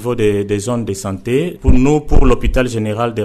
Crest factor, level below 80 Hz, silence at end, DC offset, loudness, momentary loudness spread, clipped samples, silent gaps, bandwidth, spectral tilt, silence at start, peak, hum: 10 dB; -18 dBFS; 0 s; under 0.1%; -16 LUFS; 6 LU; under 0.1%; none; 13 kHz; -6.5 dB/octave; 0 s; -2 dBFS; none